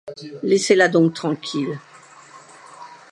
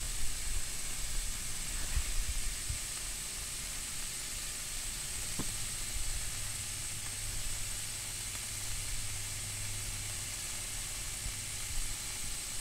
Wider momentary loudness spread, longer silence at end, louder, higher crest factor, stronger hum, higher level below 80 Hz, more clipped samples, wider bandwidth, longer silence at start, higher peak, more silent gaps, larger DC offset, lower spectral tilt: first, 26 LU vs 1 LU; first, 0.15 s vs 0 s; first, -19 LUFS vs -37 LUFS; about the same, 20 dB vs 16 dB; neither; second, -74 dBFS vs -42 dBFS; neither; second, 11.5 kHz vs 16 kHz; about the same, 0.05 s vs 0 s; first, -2 dBFS vs -20 dBFS; neither; neither; first, -5 dB/octave vs -1 dB/octave